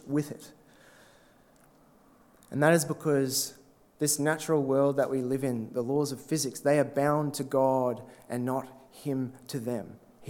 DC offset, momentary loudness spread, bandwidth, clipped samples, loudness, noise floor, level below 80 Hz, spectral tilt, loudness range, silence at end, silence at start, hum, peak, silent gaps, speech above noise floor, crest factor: under 0.1%; 12 LU; 18.5 kHz; under 0.1%; -29 LUFS; -60 dBFS; -72 dBFS; -5 dB/octave; 3 LU; 0 s; 0.05 s; none; -8 dBFS; none; 32 dB; 22 dB